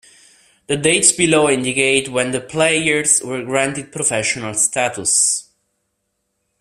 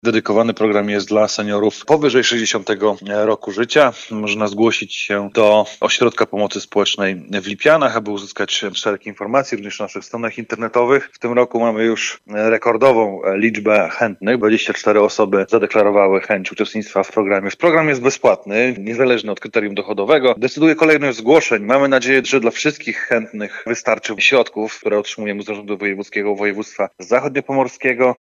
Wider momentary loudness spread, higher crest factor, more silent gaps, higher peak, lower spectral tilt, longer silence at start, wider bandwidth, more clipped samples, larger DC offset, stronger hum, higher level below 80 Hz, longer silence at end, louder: about the same, 8 LU vs 10 LU; about the same, 18 dB vs 14 dB; neither; about the same, 0 dBFS vs -2 dBFS; second, -2 dB/octave vs -4 dB/octave; first, 0.7 s vs 0.05 s; first, 15.5 kHz vs 8.4 kHz; neither; neither; neither; first, -56 dBFS vs -64 dBFS; first, 1.2 s vs 0.05 s; about the same, -16 LUFS vs -16 LUFS